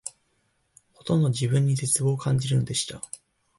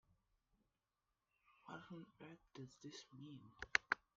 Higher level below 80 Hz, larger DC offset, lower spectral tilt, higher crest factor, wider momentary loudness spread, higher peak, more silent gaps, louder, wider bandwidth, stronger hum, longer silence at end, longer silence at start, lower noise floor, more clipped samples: first, -58 dBFS vs -78 dBFS; neither; first, -5 dB/octave vs -1.5 dB/octave; second, 16 dB vs 38 dB; second, 17 LU vs 20 LU; first, -10 dBFS vs -14 dBFS; neither; first, -24 LUFS vs -47 LUFS; first, 12 kHz vs 7.4 kHz; neither; first, 0.45 s vs 0.2 s; second, 0.05 s vs 1.65 s; second, -70 dBFS vs under -90 dBFS; neither